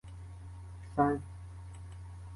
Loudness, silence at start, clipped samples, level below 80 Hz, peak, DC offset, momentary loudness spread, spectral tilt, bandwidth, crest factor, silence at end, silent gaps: -33 LUFS; 0.05 s; under 0.1%; -52 dBFS; -16 dBFS; under 0.1%; 18 LU; -8.5 dB/octave; 11.5 kHz; 22 dB; 0 s; none